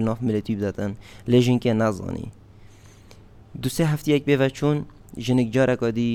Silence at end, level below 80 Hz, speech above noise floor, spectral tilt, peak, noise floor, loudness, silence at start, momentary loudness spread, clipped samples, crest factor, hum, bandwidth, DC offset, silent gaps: 0 s; -48 dBFS; 25 dB; -6.5 dB/octave; -6 dBFS; -47 dBFS; -23 LUFS; 0 s; 13 LU; under 0.1%; 18 dB; none; 18 kHz; under 0.1%; none